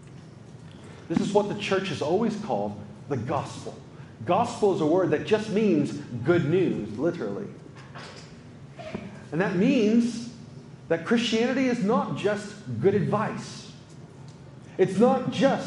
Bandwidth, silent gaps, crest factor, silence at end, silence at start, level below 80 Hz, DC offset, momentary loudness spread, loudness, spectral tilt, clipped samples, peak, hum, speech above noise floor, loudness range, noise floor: 11.5 kHz; none; 20 dB; 0 s; 0 s; -62 dBFS; under 0.1%; 23 LU; -25 LUFS; -6.5 dB/octave; under 0.1%; -6 dBFS; none; 21 dB; 4 LU; -45 dBFS